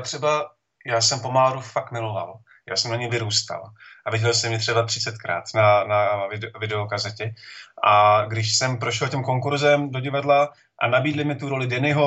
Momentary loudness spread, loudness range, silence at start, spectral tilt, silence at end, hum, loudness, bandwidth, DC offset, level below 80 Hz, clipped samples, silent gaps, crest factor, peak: 12 LU; 4 LU; 0 s; -4 dB/octave; 0 s; none; -22 LUFS; 8.2 kHz; under 0.1%; -66 dBFS; under 0.1%; none; 18 dB; -4 dBFS